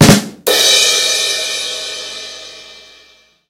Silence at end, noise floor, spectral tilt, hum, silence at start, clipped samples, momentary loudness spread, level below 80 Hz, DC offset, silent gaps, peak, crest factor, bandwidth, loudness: 0.7 s; -48 dBFS; -3 dB/octave; none; 0 s; 0.5%; 21 LU; -40 dBFS; under 0.1%; none; 0 dBFS; 14 dB; over 20 kHz; -11 LUFS